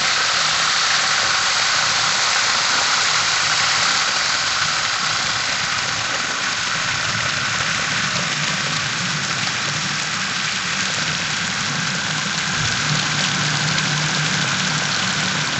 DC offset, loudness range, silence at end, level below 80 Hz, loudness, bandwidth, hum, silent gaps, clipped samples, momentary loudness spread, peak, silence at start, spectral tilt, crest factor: under 0.1%; 4 LU; 0 s; -52 dBFS; -18 LUFS; 11.5 kHz; none; none; under 0.1%; 5 LU; -2 dBFS; 0 s; -1 dB/octave; 16 dB